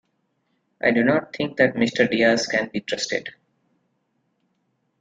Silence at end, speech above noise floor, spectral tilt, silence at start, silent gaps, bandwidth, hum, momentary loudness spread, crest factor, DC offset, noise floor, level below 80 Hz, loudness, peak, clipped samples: 1.7 s; 50 dB; -4.5 dB/octave; 0.85 s; none; 9 kHz; none; 9 LU; 20 dB; under 0.1%; -71 dBFS; -64 dBFS; -21 LUFS; -4 dBFS; under 0.1%